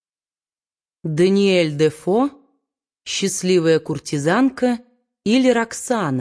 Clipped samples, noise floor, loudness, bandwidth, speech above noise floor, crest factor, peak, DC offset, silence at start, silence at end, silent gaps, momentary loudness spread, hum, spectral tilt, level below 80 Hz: under 0.1%; under -90 dBFS; -19 LUFS; 11 kHz; over 72 dB; 16 dB; -4 dBFS; under 0.1%; 1.05 s; 0 s; none; 10 LU; none; -5 dB/octave; -60 dBFS